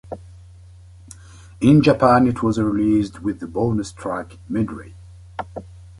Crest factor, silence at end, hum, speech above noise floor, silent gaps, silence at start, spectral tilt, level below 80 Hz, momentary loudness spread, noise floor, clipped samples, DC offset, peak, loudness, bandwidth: 18 dB; 0.1 s; none; 25 dB; none; 0.05 s; -7.5 dB/octave; -44 dBFS; 22 LU; -44 dBFS; under 0.1%; under 0.1%; -2 dBFS; -19 LUFS; 11.5 kHz